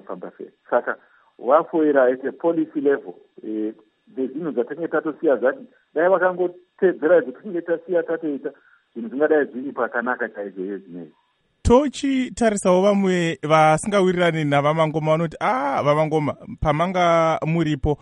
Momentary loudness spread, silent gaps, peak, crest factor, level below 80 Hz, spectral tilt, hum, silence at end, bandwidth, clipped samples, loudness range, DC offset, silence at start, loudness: 14 LU; none; -2 dBFS; 18 dB; -44 dBFS; -6 dB/octave; none; 0.05 s; 11 kHz; under 0.1%; 6 LU; under 0.1%; 0.1 s; -21 LUFS